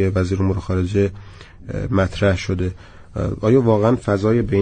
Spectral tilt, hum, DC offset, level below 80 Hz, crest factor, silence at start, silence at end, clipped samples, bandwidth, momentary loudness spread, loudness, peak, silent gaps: -8 dB/octave; none; under 0.1%; -38 dBFS; 16 dB; 0 s; 0 s; under 0.1%; 9.4 kHz; 12 LU; -19 LUFS; -4 dBFS; none